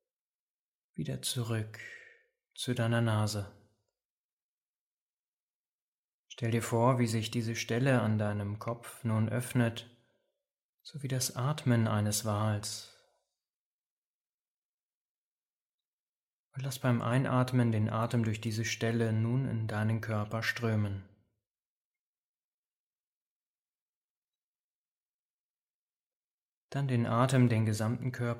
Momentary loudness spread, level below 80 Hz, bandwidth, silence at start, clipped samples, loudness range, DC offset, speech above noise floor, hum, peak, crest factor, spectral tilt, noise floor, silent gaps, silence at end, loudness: 13 LU; -70 dBFS; 16.5 kHz; 1 s; under 0.1%; 9 LU; under 0.1%; over 59 dB; none; -14 dBFS; 20 dB; -6 dB/octave; under -90 dBFS; 4.05-6.25 s, 10.62-10.79 s, 13.49-15.78 s, 15.85-16.51 s, 21.51-21.55 s, 21.65-24.32 s, 24.38-26.69 s; 0 s; -32 LUFS